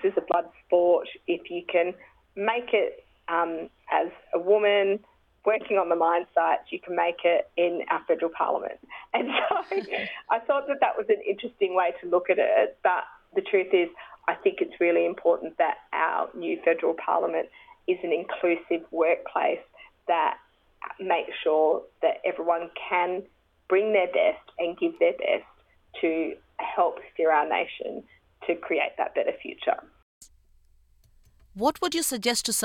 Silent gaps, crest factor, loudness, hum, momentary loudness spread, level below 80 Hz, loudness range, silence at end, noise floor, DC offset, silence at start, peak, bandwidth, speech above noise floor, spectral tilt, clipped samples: 30.02-30.21 s; 16 dB; -26 LUFS; none; 9 LU; -66 dBFS; 3 LU; 0 s; -60 dBFS; under 0.1%; 0 s; -10 dBFS; 16.5 kHz; 34 dB; -2.5 dB/octave; under 0.1%